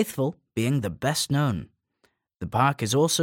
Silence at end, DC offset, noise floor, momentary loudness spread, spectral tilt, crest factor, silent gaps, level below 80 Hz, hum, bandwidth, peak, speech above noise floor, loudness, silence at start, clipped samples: 0 s; under 0.1%; -70 dBFS; 7 LU; -4.5 dB/octave; 18 dB; none; -54 dBFS; none; 17 kHz; -8 dBFS; 45 dB; -25 LUFS; 0 s; under 0.1%